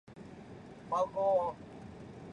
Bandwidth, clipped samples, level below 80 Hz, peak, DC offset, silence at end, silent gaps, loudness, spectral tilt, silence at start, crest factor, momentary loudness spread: 10 kHz; under 0.1%; -64 dBFS; -20 dBFS; under 0.1%; 0 s; none; -33 LUFS; -7 dB/octave; 0.1 s; 16 dB; 20 LU